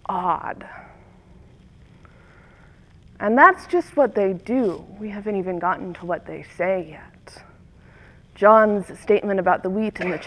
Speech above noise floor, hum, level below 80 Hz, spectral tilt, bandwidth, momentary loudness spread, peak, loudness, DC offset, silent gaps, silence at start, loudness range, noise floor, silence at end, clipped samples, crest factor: 29 dB; none; -54 dBFS; -7 dB/octave; 11 kHz; 18 LU; 0 dBFS; -20 LUFS; under 0.1%; none; 0.1 s; 8 LU; -50 dBFS; 0 s; under 0.1%; 22 dB